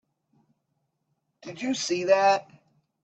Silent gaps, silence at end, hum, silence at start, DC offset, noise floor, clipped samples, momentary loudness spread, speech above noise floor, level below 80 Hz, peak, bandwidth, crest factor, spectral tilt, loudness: none; 0.6 s; none; 1.45 s; under 0.1%; -77 dBFS; under 0.1%; 20 LU; 53 dB; -76 dBFS; -8 dBFS; 8.6 kHz; 20 dB; -3 dB/octave; -24 LUFS